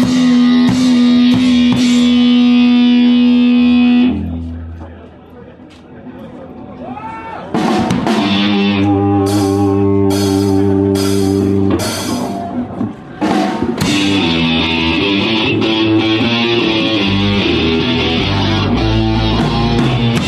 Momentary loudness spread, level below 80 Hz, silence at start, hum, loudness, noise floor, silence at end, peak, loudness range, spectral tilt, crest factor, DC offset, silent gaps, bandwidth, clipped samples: 14 LU; -32 dBFS; 0 s; none; -12 LUFS; -36 dBFS; 0 s; 0 dBFS; 8 LU; -5.5 dB/octave; 12 dB; under 0.1%; none; 13.5 kHz; under 0.1%